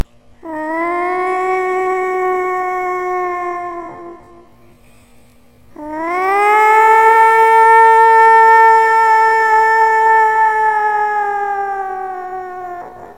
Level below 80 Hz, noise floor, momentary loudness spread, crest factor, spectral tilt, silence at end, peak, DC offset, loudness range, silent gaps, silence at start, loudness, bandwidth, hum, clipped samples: -54 dBFS; -48 dBFS; 19 LU; 12 dB; -3.5 dB/octave; 0.05 s; 0 dBFS; 0.4%; 14 LU; none; 0.45 s; -11 LUFS; 16 kHz; none; under 0.1%